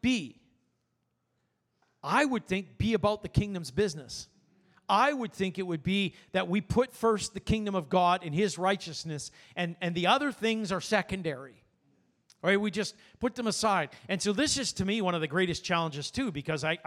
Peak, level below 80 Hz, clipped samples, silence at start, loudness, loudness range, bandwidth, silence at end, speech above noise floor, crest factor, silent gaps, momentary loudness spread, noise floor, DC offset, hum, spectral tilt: -10 dBFS; -54 dBFS; under 0.1%; 0.05 s; -30 LUFS; 3 LU; 14.5 kHz; 0.1 s; 49 dB; 20 dB; none; 10 LU; -78 dBFS; under 0.1%; none; -4.5 dB/octave